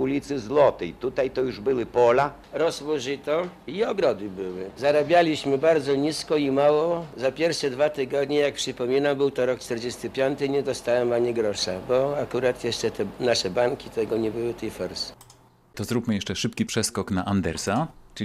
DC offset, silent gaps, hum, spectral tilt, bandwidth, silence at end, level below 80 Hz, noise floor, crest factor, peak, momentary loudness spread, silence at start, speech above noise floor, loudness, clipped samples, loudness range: under 0.1%; none; none; -4.5 dB/octave; 15 kHz; 0 s; -54 dBFS; -54 dBFS; 18 dB; -6 dBFS; 10 LU; 0 s; 30 dB; -25 LUFS; under 0.1%; 5 LU